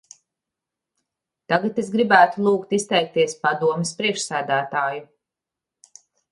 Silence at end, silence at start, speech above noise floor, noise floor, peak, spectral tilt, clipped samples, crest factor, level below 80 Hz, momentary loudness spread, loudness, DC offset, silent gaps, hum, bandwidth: 1.25 s; 1.5 s; 67 dB; -87 dBFS; 0 dBFS; -4 dB/octave; under 0.1%; 22 dB; -70 dBFS; 9 LU; -20 LUFS; under 0.1%; none; none; 11.5 kHz